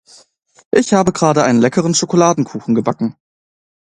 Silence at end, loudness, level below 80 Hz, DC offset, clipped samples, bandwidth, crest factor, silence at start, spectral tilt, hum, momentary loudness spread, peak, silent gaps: 0.85 s; -14 LUFS; -54 dBFS; under 0.1%; under 0.1%; 11 kHz; 16 dB; 0.75 s; -5 dB/octave; none; 7 LU; 0 dBFS; none